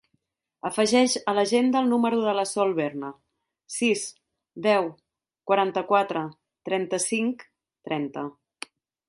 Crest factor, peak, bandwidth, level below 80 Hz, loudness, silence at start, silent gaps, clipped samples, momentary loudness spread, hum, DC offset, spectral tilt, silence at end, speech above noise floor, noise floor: 18 dB; -6 dBFS; 11.5 kHz; -72 dBFS; -25 LUFS; 0.65 s; none; under 0.1%; 18 LU; none; under 0.1%; -3.5 dB/octave; 0.8 s; 51 dB; -75 dBFS